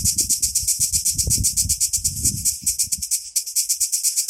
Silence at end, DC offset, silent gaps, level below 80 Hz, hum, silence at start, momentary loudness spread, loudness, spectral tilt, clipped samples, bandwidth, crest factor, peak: 0 s; under 0.1%; none; -38 dBFS; none; 0 s; 4 LU; -18 LUFS; -0.5 dB/octave; under 0.1%; 16.5 kHz; 20 dB; -2 dBFS